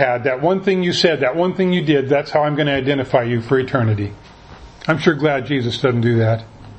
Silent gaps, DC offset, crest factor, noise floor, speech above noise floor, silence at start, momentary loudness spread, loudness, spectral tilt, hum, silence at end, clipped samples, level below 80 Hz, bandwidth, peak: none; under 0.1%; 18 dB; -40 dBFS; 23 dB; 0 s; 4 LU; -17 LUFS; -6.5 dB/octave; none; 0 s; under 0.1%; -48 dBFS; 8.6 kHz; 0 dBFS